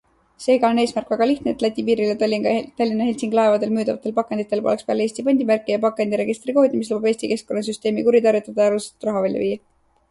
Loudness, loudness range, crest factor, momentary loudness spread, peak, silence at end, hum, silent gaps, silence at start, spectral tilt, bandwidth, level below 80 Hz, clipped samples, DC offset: -20 LUFS; 1 LU; 16 dB; 6 LU; -4 dBFS; 0.55 s; none; none; 0.4 s; -5.5 dB/octave; 11.5 kHz; -60 dBFS; under 0.1%; under 0.1%